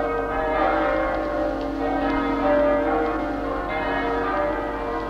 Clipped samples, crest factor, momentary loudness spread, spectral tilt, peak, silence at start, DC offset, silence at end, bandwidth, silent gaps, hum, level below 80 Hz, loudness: under 0.1%; 14 dB; 6 LU; -7 dB/octave; -8 dBFS; 0 s; under 0.1%; 0 s; 9.2 kHz; none; 50 Hz at -40 dBFS; -38 dBFS; -23 LUFS